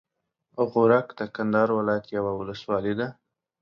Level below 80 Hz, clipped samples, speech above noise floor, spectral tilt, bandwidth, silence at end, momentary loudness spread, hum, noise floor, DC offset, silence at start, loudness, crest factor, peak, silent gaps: -62 dBFS; under 0.1%; 47 dB; -8.5 dB/octave; 6.6 kHz; 0.5 s; 12 LU; none; -71 dBFS; under 0.1%; 0.55 s; -25 LUFS; 18 dB; -6 dBFS; none